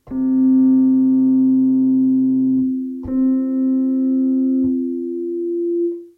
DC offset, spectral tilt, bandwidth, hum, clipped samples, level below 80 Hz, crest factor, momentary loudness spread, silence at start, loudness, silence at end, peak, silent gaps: under 0.1%; -12 dB/octave; 1.8 kHz; none; under 0.1%; -52 dBFS; 8 dB; 9 LU; 0.05 s; -17 LUFS; 0.1 s; -8 dBFS; none